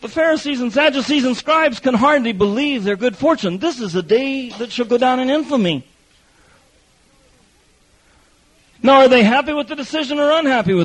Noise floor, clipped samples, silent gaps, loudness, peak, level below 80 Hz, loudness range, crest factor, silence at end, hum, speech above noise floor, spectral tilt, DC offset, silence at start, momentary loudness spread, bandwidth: -55 dBFS; under 0.1%; none; -16 LUFS; -2 dBFS; -52 dBFS; 7 LU; 16 dB; 0 s; none; 39 dB; -5 dB/octave; under 0.1%; 0 s; 10 LU; 10.5 kHz